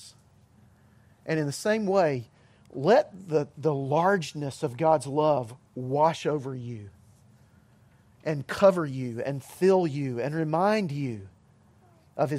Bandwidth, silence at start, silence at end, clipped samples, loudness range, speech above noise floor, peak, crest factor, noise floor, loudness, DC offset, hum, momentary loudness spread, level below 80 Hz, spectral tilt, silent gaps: 15 kHz; 0 s; 0 s; under 0.1%; 4 LU; 33 dB; -6 dBFS; 22 dB; -59 dBFS; -27 LUFS; under 0.1%; none; 15 LU; -66 dBFS; -6.5 dB/octave; none